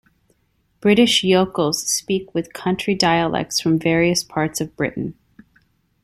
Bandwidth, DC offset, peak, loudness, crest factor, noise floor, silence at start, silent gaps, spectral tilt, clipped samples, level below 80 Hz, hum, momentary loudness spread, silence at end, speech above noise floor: 15.5 kHz; under 0.1%; -2 dBFS; -19 LUFS; 18 dB; -65 dBFS; 0.85 s; none; -4 dB/octave; under 0.1%; -52 dBFS; none; 10 LU; 0.9 s; 46 dB